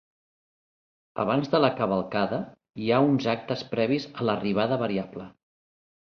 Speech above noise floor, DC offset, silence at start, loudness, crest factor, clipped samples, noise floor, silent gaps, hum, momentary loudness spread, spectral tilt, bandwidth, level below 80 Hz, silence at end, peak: over 65 dB; under 0.1%; 1.15 s; -26 LUFS; 20 dB; under 0.1%; under -90 dBFS; none; none; 14 LU; -7.5 dB/octave; 6.6 kHz; -62 dBFS; 0.75 s; -6 dBFS